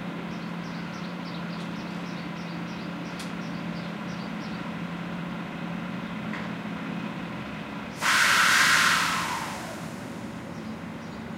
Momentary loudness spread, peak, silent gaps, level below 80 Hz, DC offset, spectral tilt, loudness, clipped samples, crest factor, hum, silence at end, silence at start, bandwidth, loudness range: 18 LU; -8 dBFS; none; -58 dBFS; under 0.1%; -3 dB/octave; -28 LUFS; under 0.1%; 22 dB; none; 0 s; 0 s; 16 kHz; 11 LU